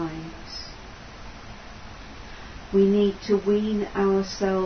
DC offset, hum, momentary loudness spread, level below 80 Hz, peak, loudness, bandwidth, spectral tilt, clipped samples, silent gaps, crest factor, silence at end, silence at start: under 0.1%; none; 21 LU; -46 dBFS; -10 dBFS; -23 LUFS; 6.6 kHz; -6.5 dB/octave; under 0.1%; none; 16 dB; 0 s; 0 s